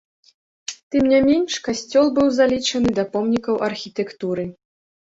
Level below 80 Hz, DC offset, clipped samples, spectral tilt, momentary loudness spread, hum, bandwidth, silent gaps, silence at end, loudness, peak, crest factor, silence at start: -50 dBFS; under 0.1%; under 0.1%; -4.5 dB/octave; 12 LU; none; 8 kHz; 0.83-0.91 s; 0.6 s; -20 LUFS; -4 dBFS; 16 dB; 0.7 s